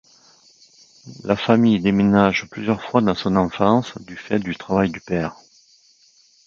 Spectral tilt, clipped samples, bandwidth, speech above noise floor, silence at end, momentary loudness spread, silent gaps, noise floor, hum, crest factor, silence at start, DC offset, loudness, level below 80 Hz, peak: -7 dB/octave; under 0.1%; 7.2 kHz; 37 dB; 1.15 s; 9 LU; none; -56 dBFS; none; 20 dB; 1.05 s; under 0.1%; -19 LUFS; -50 dBFS; 0 dBFS